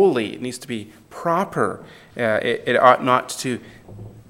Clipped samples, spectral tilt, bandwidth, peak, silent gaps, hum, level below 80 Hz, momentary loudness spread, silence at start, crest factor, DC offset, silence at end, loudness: under 0.1%; -4.5 dB/octave; 16.5 kHz; 0 dBFS; none; none; -60 dBFS; 23 LU; 0 s; 20 dB; under 0.1%; 0.1 s; -20 LUFS